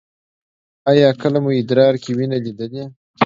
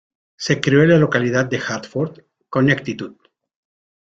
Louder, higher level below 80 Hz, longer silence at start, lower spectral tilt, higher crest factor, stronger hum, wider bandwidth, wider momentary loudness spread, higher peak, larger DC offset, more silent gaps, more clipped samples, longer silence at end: about the same, -16 LUFS vs -18 LUFS; second, -64 dBFS vs -56 dBFS; first, 0.85 s vs 0.4 s; first, -7.5 dB/octave vs -6 dB/octave; about the same, 18 dB vs 18 dB; neither; about the same, 7.6 kHz vs 7.8 kHz; about the same, 15 LU vs 15 LU; about the same, 0 dBFS vs -2 dBFS; neither; first, 2.96-3.14 s vs none; neither; second, 0 s vs 0.95 s